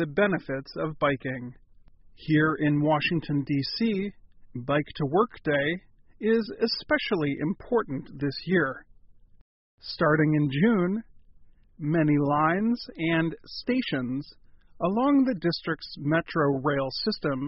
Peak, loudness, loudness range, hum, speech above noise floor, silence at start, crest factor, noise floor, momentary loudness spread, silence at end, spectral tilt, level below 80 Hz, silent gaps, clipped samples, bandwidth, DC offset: -8 dBFS; -26 LUFS; 2 LU; none; 27 dB; 0 s; 18 dB; -53 dBFS; 12 LU; 0 s; -5 dB/octave; -56 dBFS; 9.41-9.78 s; under 0.1%; 5.8 kHz; under 0.1%